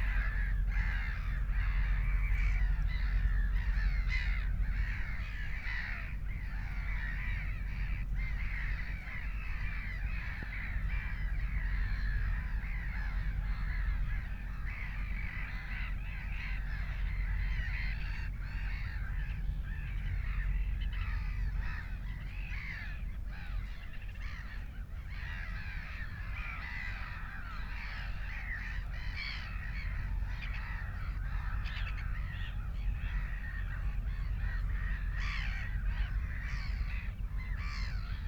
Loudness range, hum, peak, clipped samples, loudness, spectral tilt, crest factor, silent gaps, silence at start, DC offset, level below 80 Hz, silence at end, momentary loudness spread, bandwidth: 7 LU; none; -20 dBFS; under 0.1%; -39 LUFS; -6 dB/octave; 14 dB; none; 0 s; under 0.1%; -36 dBFS; 0 s; 7 LU; 6.2 kHz